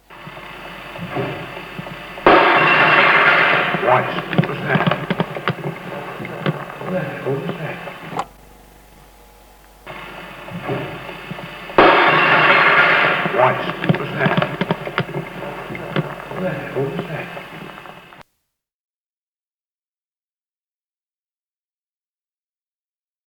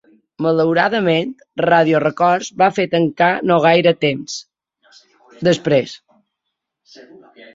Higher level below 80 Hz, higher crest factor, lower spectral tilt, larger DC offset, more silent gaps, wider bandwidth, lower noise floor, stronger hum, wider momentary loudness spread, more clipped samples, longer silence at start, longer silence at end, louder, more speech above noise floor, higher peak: first, -50 dBFS vs -60 dBFS; about the same, 20 dB vs 16 dB; about the same, -6 dB/octave vs -5.5 dB/octave; neither; neither; first, 19.5 kHz vs 7.8 kHz; first, under -90 dBFS vs -78 dBFS; neither; first, 21 LU vs 9 LU; neither; second, 0.1 s vs 0.4 s; first, 5.15 s vs 0.1 s; about the same, -16 LUFS vs -16 LUFS; first, over 70 dB vs 62 dB; about the same, 0 dBFS vs 0 dBFS